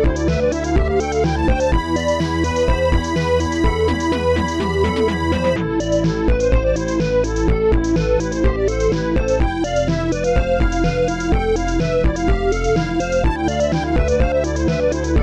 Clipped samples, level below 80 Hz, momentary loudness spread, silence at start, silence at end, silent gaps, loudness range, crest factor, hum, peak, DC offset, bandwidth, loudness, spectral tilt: under 0.1%; -22 dBFS; 2 LU; 0 s; 0 s; none; 1 LU; 12 dB; none; -6 dBFS; 0.5%; 10.5 kHz; -18 LUFS; -6.5 dB/octave